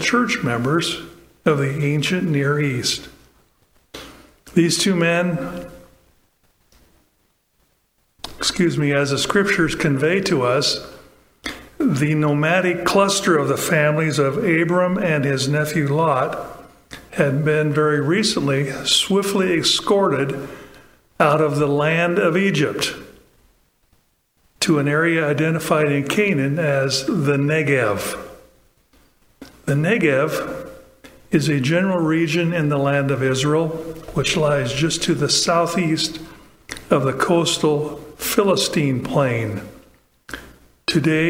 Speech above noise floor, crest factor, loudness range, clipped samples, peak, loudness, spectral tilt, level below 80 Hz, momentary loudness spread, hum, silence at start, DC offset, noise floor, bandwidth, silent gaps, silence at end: 46 dB; 20 dB; 4 LU; under 0.1%; 0 dBFS; -19 LUFS; -4.5 dB/octave; -50 dBFS; 14 LU; none; 0 s; under 0.1%; -65 dBFS; 16.5 kHz; none; 0 s